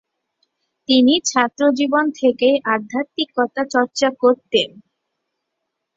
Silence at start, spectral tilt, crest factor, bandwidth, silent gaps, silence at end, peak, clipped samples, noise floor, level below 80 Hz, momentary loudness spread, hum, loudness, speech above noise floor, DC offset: 0.9 s; -2.5 dB/octave; 18 dB; 7.8 kHz; none; 1.3 s; -2 dBFS; under 0.1%; -77 dBFS; -64 dBFS; 8 LU; none; -18 LUFS; 60 dB; under 0.1%